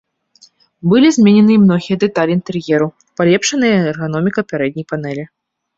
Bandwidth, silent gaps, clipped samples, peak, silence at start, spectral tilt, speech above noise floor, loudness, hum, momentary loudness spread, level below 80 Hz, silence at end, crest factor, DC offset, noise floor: 7.8 kHz; none; under 0.1%; -2 dBFS; 0.85 s; -6 dB/octave; 37 dB; -14 LUFS; none; 13 LU; -54 dBFS; 0.5 s; 12 dB; under 0.1%; -50 dBFS